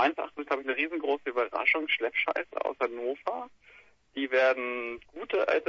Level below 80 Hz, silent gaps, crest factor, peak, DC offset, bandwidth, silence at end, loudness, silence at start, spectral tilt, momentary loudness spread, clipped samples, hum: -70 dBFS; none; 20 dB; -10 dBFS; under 0.1%; 7.2 kHz; 0.05 s; -29 LUFS; 0 s; -4 dB/octave; 12 LU; under 0.1%; none